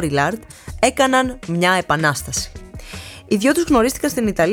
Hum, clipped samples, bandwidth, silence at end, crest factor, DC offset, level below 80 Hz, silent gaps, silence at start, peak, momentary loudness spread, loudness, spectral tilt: none; under 0.1%; 19.5 kHz; 0 s; 18 dB; under 0.1%; -40 dBFS; none; 0 s; -2 dBFS; 18 LU; -18 LUFS; -4 dB/octave